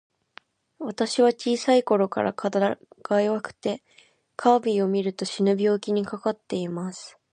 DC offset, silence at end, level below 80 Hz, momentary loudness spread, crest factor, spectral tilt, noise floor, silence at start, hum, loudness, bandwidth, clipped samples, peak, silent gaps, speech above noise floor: under 0.1%; 0.25 s; -72 dBFS; 14 LU; 20 dB; -5.5 dB/octave; -53 dBFS; 0.8 s; none; -24 LUFS; 11 kHz; under 0.1%; -4 dBFS; none; 29 dB